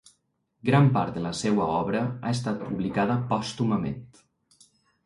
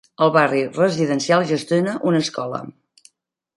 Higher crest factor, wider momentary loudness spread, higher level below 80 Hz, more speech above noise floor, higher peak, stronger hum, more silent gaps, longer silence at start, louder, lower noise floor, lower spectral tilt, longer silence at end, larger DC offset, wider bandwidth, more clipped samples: about the same, 18 dB vs 18 dB; about the same, 9 LU vs 11 LU; first, -56 dBFS vs -68 dBFS; about the same, 47 dB vs 48 dB; second, -8 dBFS vs -2 dBFS; neither; neither; first, 0.65 s vs 0.2 s; second, -26 LUFS vs -19 LUFS; first, -73 dBFS vs -66 dBFS; about the same, -6.5 dB/octave vs -5.5 dB/octave; first, 1 s vs 0.85 s; neither; about the same, 11.5 kHz vs 11.5 kHz; neither